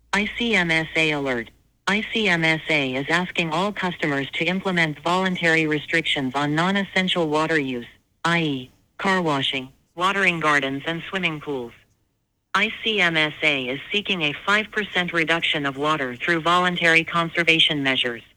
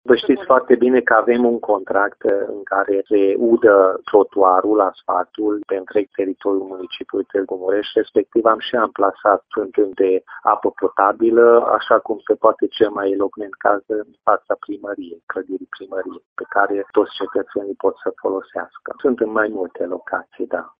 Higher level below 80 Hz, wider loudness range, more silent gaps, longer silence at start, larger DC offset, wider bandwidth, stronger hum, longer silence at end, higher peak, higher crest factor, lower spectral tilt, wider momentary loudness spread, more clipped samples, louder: first, -56 dBFS vs -62 dBFS; second, 3 LU vs 7 LU; second, none vs 15.23-15.27 s, 16.26-16.36 s; about the same, 0.15 s vs 0.05 s; neither; first, 19 kHz vs 5.2 kHz; neither; about the same, 0.15 s vs 0.1 s; about the same, -2 dBFS vs 0 dBFS; about the same, 20 dB vs 18 dB; second, -4.5 dB/octave vs -8.5 dB/octave; second, 9 LU vs 13 LU; neither; second, -21 LUFS vs -18 LUFS